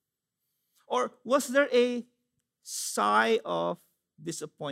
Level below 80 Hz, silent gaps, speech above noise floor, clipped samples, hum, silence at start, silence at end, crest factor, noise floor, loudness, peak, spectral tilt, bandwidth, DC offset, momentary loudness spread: -86 dBFS; none; 57 dB; under 0.1%; none; 0.9 s; 0 s; 20 dB; -85 dBFS; -28 LUFS; -10 dBFS; -3 dB/octave; 16 kHz; under 0.1%; 14 LU